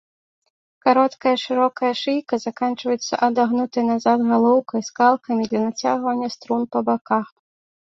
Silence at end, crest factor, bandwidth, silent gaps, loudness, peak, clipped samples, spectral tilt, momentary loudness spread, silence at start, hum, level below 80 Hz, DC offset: 0.65 s; 18 dB; 7.6 kHz; 7.01-7.05 s; -20 LUFS; -2 dBFS; under 0.1%; -4.5 dB/octave; 7 LU; 0.85 s; none; -68 dBFS; under 0.1%